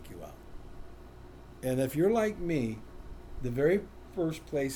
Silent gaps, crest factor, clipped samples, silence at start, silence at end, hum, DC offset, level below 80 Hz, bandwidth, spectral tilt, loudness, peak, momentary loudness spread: none; 18 dB; under 0.1%; 0 s; 0 s; none; under 0.1%; -50 dBFS; over 20 kHz; -6.5 dB/octave; -31 LUFS; -16 dBFS; 24 LU